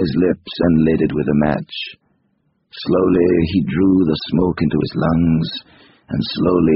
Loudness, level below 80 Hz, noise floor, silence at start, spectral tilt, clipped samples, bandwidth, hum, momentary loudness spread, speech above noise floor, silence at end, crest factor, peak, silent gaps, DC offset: -17 LUFS; -40 dBFS; -64 dBFS; 0 s; -6.5 dB/octave; under 0.1%; 5.8 kHz; none; 11 LU; 48 dB; 0 s; 16 dB; -2 dBFS; none; under 0.1%